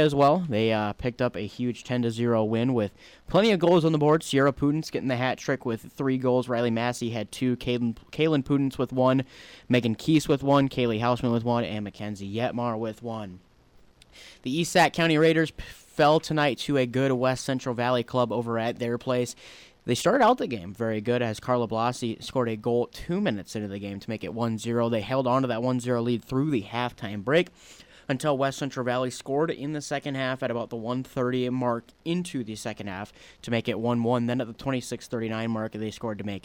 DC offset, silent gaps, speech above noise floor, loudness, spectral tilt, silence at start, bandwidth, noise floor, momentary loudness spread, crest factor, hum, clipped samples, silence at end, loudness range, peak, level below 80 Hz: under 0.1%; none; 31 dB; -26 LUFS; -6 dB/octave; 0 s; 17 kHz; -57 dBFS; 11 LU; 16 dB; none; under 0.1%; 0.05 s; 6 LU; -12 dBFS; -56 dBFS